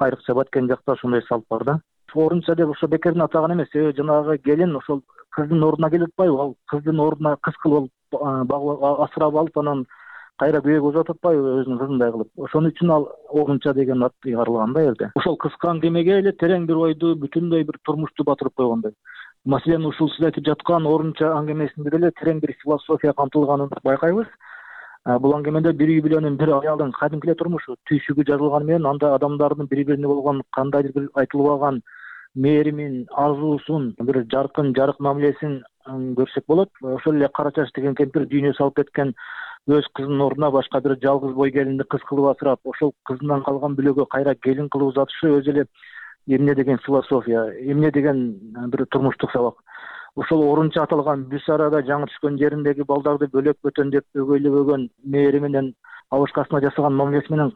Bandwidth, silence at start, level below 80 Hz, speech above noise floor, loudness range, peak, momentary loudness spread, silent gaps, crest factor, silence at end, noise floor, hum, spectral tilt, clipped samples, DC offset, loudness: 4.5 kHz; 0 s; -60 dBFS; 22 dB; 2 LU; -8 dBFS; 7 LU; none; 12 dB; 0.05 s; -41 dBFS; none; -10.5 dB/octave; under 0.1%; under 0.1%; -20 LUFS